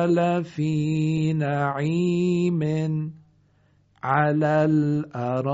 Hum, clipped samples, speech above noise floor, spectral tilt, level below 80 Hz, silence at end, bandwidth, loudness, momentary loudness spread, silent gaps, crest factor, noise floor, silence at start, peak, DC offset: none; under 0.1%; 39 dB; -7.5 dB/octave; -60 dBFS; 0 s; 7.8 kHz; -23 LUFS; 6 LU; none; 16 dB; -61 dBFS; 0 s; -6 dBFS; under 0.1%